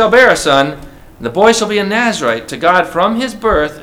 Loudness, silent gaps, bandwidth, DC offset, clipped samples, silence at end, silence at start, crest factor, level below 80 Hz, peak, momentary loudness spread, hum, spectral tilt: -12 LUFS; none; 16.5 kHz; under 0.1%; 0.3%; 0 s; 0 s; 12 dB; -36 dBFS; 0 dBFS; 10 LU; none; -3.5 dB/octave